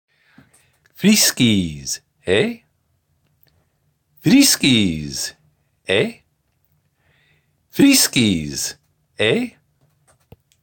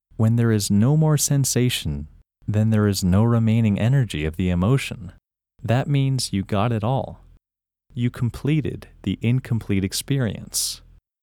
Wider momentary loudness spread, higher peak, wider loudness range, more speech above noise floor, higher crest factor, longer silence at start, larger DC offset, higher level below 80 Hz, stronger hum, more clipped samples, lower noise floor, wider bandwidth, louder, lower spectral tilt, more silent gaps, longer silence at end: about the same, 15 LU vs 13 LU; first, -2 dBFS vs -6 dBFS; second, 2 LU vs 5 LU; second, 49 dB vs 69 dB; about the same, 18 dB vs 16 dB; first, 1 s vs 0.2 s; neither; second, -50 dBFS vs -44 dBFS; neither; neither; second, -66 dBFS vs -89 dBFS; about the same, 17 kHz vs 17.5 kHz; first, -17 LUFS vs -21 LUFS; second, -3.5 dB/octave vs -5.5 dB/octave; neither; first, 1.15 s vs 0.45 s